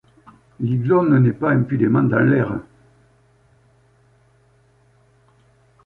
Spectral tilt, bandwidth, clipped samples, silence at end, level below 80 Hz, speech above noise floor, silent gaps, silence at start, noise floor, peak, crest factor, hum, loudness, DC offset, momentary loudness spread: -11 dB/octave; 4 kHz; under 0.1%; 3.25 s; -54 dBFS; 40 dB; none; 0.6 s; -57 dBFS; -4 dBFS; 18 dB; none; -18 LUFS; under 0.1%; 9 LU